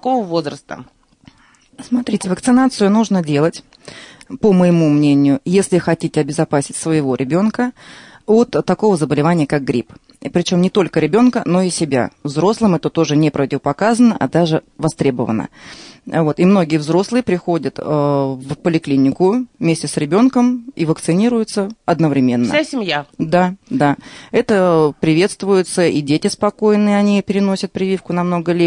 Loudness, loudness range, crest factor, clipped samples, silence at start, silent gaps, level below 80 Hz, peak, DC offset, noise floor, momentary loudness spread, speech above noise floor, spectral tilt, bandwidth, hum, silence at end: -16 LUFS; 2 LU; 14 dB; under 0.1%; 0.05 s; none; -52 dBFS; -2 dBFS; under 0.1%; -50 dBFS; 8 LU; 35 dB; -6 dB/octave; 11 kHz; none; 0 s